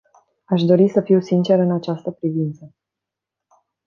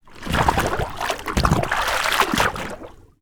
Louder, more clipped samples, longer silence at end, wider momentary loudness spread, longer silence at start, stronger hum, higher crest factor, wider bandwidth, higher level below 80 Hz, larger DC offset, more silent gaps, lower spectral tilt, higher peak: first, -18 LUFS vs -21 LUFS; neither; first, 1.2 s vs 0.2 s; about the same, 10 LU vs 9 LU; first, 0.5 s vs 0.05 s; neither; about the same, 18 dB vs 20 dB; second, 7 kHz vs over 20 kHz; second, -68 dBFS vs -32 dBFS; neither; neither; first, -9 dB/octave vs -4 dB/octave; about the same, -2 dBFS vs -2 dBFS